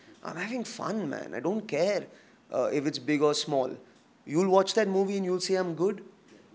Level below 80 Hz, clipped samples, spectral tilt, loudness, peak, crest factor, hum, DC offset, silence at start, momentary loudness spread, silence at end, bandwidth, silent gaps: -82 dBFS; under 0.1%; -5 dB/octave; -29 LUFS; -8 dBFS; 20 dB; none; under 0.1%; 0.1 s; 11 LU; 0.2 s; 8 kHz; none